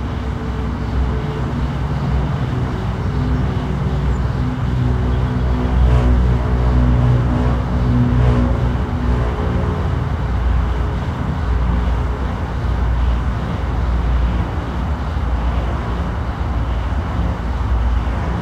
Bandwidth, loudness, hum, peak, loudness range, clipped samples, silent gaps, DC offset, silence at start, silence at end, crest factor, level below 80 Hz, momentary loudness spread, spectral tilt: 7.4 kHz; -19 LUFS; none; -2 dBFS; 5 LU; under 0.1%; none; under 0.1%; 0 s; 0 s; 14 dB; -20 dBFS; 7 LU; -8.5 dB/octave